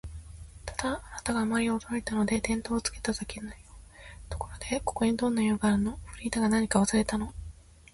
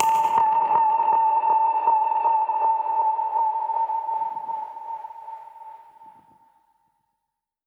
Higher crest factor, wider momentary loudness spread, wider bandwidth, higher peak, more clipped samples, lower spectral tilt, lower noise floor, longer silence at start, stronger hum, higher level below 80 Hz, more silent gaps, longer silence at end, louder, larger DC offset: about the same, 20 dB vs 20 dB; first, 20 LU vs 17 LU; second, 11.5 kHz vs 16 kHz; second, -10 dBFS vs -2 dBFS; neither; about the same, -4.5 dB/octave vs -3.5 dB/octave; second, -49 dBFS vs -82 dBFS; about the same, 0.05 s vs 0 s; neither; first, -46 dBFS vs -78 dBFS; neither; second, 0.4 s vs 1.6 s; second, -29 LUFS vs -22 LUFS; neither